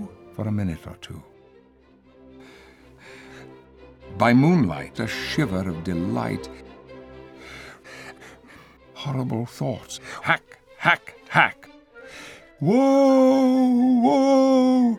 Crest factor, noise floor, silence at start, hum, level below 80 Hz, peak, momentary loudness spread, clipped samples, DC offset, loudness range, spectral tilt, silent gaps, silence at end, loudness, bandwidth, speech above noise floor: 22 dB; -55 dBFS; 0 s; none; -54 dBFS; 0 dBFS; 24 LU; under 0.1%; under 0.1%; 15 LU; -6.5 dB/octave; none; 0 s; -21 LUFS; 13 kHz; 34 dB